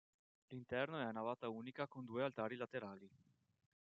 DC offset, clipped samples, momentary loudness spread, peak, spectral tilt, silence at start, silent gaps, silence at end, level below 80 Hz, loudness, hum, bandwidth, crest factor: under 0.1%; under 0.1%; 12 LU; -26 dBFS; -4.5 dB/octave; 0.5 s; none; 0.85 s; -86 dBFS; -46 LUFS; none; 7.4 kHz; 22 dB